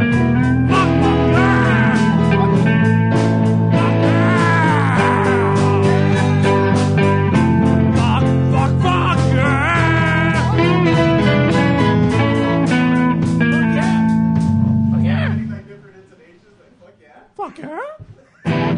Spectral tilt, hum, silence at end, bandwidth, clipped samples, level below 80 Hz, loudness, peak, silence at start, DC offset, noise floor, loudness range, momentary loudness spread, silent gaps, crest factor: -7.5 dB/octave; none; 0 s; 10 kHz; under 0.1%; -36 dBFS; -14 LUFS; -2 dBFS; 0 s; under 0.1%; -49 dBFS; 6 LU; 3 LU; none; 14 dB